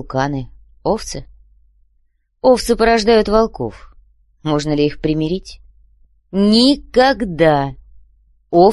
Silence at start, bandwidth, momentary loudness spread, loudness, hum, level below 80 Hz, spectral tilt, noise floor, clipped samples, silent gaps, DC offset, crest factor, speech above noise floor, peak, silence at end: 0 s; 12.5 kHz; 15 LU; -16 LUFS; none; -38 dBFS; -5.5 dB/octave; -60 dBFS; under 0.1%; none; under 0.1%; 16 dB; 45 dB; 0 dBFS; 0 s